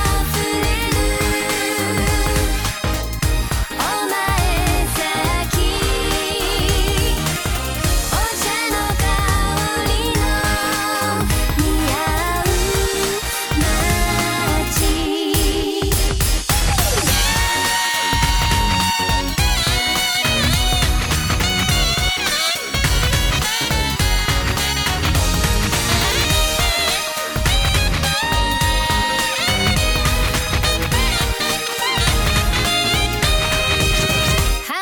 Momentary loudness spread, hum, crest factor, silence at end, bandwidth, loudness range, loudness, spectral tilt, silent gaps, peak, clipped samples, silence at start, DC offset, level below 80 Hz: 3 LU; none; 14 dB; 0 s; 18 kHz; 2 LU; -17 LUFS; -3 dB/octave; none; -2 dBFS; under 0.1%; 0 s; under 0.1%; -22 dBFS